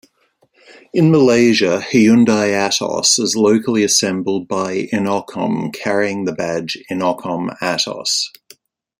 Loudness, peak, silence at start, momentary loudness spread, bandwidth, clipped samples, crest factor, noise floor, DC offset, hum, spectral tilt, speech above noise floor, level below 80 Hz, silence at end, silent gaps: -16 LUFS; 0 dBFS; 0.7 s; 10 LU; 16 kHz; under 0.1%; 16 dB; -60 dBFS; under 0.1%; none; -4 dB/octave; 44 dB; -58 dBFS; 0.7 s; none